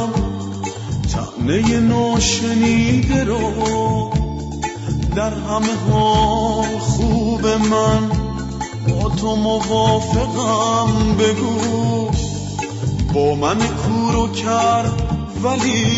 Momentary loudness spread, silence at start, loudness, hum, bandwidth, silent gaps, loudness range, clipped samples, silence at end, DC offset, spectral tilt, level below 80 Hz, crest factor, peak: 8 LU; 0 s; -18 LUFS; none; 8 kHz; none; 2 LU; under 0.1%; 0 s; under 0.1%; -5.5 dB/octave; -30 dBFS; 14 dB; -4 dBFS